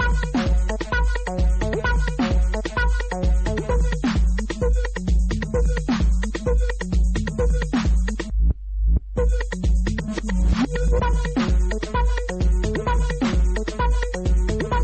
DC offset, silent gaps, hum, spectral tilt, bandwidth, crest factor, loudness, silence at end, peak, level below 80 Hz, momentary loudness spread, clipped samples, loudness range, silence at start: 0.2%; none; none; -6.5 dB/octave; 8.8 kHz; 12 dB; -23 LUFS; 0 s; -8 dBFS; -22 dBFS; 2 LU; under 0.1%; 1 LU; 0 s